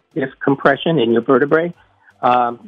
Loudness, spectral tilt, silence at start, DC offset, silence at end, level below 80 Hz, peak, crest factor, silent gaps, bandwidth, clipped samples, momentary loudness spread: -16 LUFS; -8.5 dB/octave; 0.15 s; under 0.1%; 0 s; -60 dBFS; 0 dBFS; 16 dB; none; 5.8 kHz; under 0.1%; 7 LU